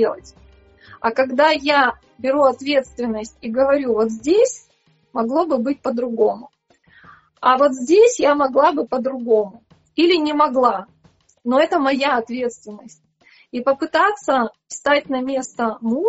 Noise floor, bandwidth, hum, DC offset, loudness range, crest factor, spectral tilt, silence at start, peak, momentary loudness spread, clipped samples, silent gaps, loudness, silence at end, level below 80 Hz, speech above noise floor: -60 dBFS; 8 kHz; none; under 0.1%; 4 LU; 16 dB; -2 dB/octave; 0 s; -2 dBFS; 11 LU; under 0.1%; none; -18 LUFS; 0 s; -58 dBFS; 42 dB